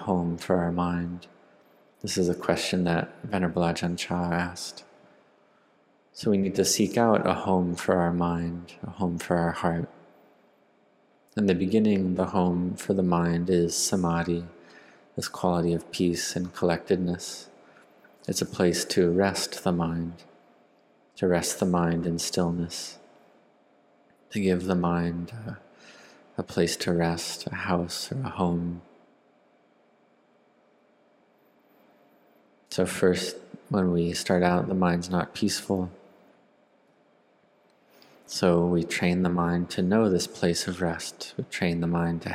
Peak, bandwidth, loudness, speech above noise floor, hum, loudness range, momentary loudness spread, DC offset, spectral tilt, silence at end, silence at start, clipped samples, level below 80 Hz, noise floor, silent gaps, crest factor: -6 dBFS; 15.5 kHz; -27 LUFS; 37 dB; none; 6 LU; 12 LU; under 0.1%; -5 dB/octave; 0 s; 0 s; under 0.1%; -60 dBFS; -63 dBFS; none; 22 dB